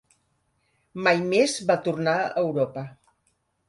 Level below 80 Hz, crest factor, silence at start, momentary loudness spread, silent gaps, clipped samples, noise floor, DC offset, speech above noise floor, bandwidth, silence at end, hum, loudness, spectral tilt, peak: -68 dBFS; 20 dB; 0.95 s; 15 LU; none; under 0.1%; -71 dBFS; under 0.1%; 48 dB; 11.5 kHz; 0.75 s; none; -24 LUFS; -4.5 dB/octave; -6 dBFS